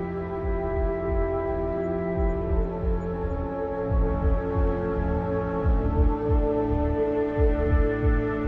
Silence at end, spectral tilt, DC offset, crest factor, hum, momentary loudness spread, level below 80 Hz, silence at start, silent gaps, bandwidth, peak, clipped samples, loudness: 0 s; -11 dB/octave; under 0.1%; 14 dB; none; 5 LU; -28 dBFS; 0 s; none; 4.2 kHz; -10 dBFS; under 0.1%; -26 LUFS